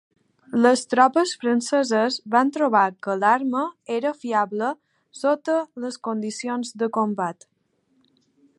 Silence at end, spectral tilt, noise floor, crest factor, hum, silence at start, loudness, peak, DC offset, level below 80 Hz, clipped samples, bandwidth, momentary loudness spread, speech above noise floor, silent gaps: 1.25 s; -4 dB/octave; -68 dBFS; 20 dB; none; 0.5 s; -22 LUFS; -2 dBFS; under 0.1%; -80 dBFS; under 0.1%; 11.5 kHz; 10 LU; 46 dB; none